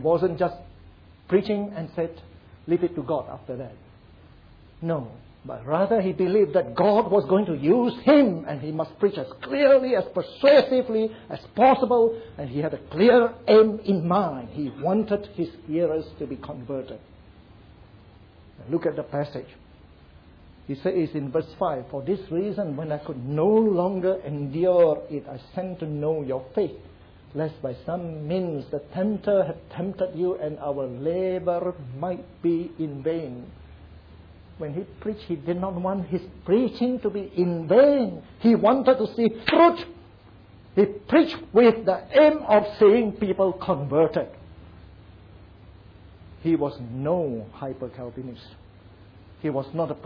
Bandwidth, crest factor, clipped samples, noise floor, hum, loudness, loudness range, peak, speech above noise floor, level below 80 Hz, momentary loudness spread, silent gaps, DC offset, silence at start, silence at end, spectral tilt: 5.4 kHz; 16 dB; under 0.1%; -50 dBFS; none; -23 LUFS; 11 LU; -8 dBFS; 27 dB; -54 dBFS; 16 LU; none; under 0.1%; 0 s; 0 s; -9.5 dB/octave